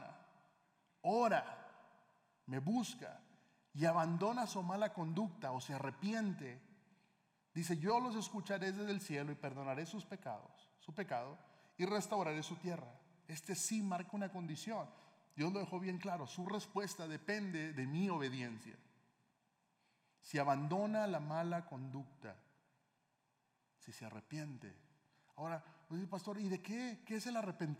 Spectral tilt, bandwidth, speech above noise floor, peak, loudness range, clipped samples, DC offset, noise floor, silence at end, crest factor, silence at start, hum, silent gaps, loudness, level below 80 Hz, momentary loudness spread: -5.5 dB/octave; 16 kHz; 41 dB; -22 dBFS; 8 LU; under 0.1%; under 0.1%; -82 dBFS; 0 s; 20 dB; 0 s; none; none; -42 LUFS; under -90 dBFS; 17 LU